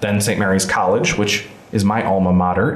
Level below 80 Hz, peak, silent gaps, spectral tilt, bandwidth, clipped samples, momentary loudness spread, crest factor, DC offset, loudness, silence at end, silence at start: -44 dBFS; -6 dBFS; none; -5 dB/octave; 15 kHz; under 0.1%; 4 LU; 10 dB; under 0.1%; -17 LUFS; 0 s; 0 s